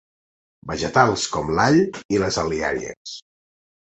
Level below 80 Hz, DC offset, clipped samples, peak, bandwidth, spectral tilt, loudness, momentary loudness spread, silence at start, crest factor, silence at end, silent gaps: -46 dBFS; under 0.1%; under 0.1%; -2 dBFS; 8.4 kHz; -4.5 dB/octave; -20 LUFS; 18 LU; 0.65 s; 20 dB; 0.75 s; 2.05-2.09 s, 2.97-3.05 s